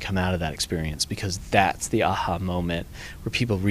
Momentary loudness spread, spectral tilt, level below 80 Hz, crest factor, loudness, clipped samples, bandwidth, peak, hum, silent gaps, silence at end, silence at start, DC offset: 8 LU; -4.5 dB/octave; -40 dBFS; 22 dB; -25 LUFS; under 0.1%; 15.5 kHz; -2 dBFS; none; none; 0 s; 0 s; under 0.1%